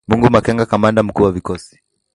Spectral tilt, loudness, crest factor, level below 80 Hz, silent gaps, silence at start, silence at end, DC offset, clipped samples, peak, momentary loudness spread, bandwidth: -7.5 dB/octave; -14 LUFS; 16 dB; -38 dBFS; none; 0.1 s; 0.5 s; under 0.1%; under 0.1%; 0 dBFS; 13 LU; 11.5 kHz